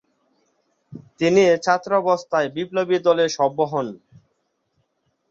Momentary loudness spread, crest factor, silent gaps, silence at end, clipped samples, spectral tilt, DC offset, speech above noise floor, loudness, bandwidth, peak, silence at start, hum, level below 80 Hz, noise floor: 8 LU; 18 dB; none; 1.35 s; under 0.1%; -5 dB/octave; under 0.1%; 52 dB; -20 LUFS; 7.8 kHz; -4 dBFS; 0.9 s; none; -66 dBFS; -71 dBFS